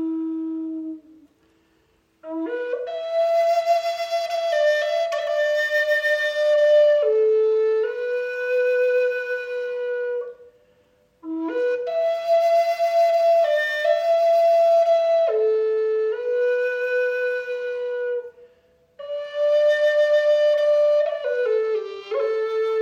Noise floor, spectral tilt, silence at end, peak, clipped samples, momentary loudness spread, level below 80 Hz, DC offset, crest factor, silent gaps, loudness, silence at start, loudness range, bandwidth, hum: -63 dBFS; -2 dB/octave; 0 s; -8 dBFS; under 0.1%; 11 LU; -74 dBFS; under 0.1%; 12 dB; none; -21 LUFS; 0 s; 7 LU; 16 kHz; none